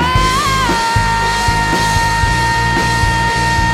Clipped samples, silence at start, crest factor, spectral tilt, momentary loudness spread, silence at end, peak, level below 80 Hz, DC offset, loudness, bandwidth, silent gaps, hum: under 0.1%; 0 s; 12 dB; -3.5 dB/octave; 1 LU; 0 s; -2 dBFS; -22 dBFS; under 0.1%; -13 LUFS; 16.5 kHz; none; none